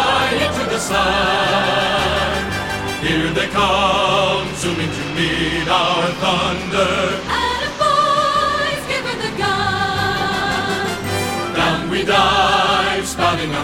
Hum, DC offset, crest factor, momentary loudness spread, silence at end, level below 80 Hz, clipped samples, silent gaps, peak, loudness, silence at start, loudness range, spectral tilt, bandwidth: none; under 0.1%; 16 dB; 6 LU; 0 s; -38 dBFS; under 0.1%; none; 0 dBFS; -17 LUFS; 0 s; 2 LU; -3.5 dB/octave; 17.5 kHz